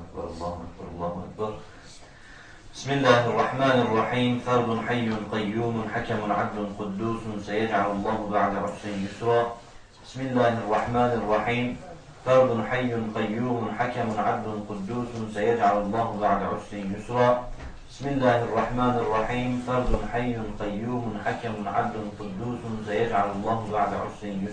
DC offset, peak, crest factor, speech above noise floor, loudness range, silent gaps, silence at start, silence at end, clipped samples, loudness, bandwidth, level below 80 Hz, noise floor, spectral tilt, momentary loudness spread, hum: under 0.1%; -4 dBFS; 22 dB; 21 dB; 4 LU; none; 0 s; 0 s; under 0.1%; -26 LUFS; 9.8 kHz; -44 dBFS; -47 dBFS; -6.5 dB/octave; 12 LU; none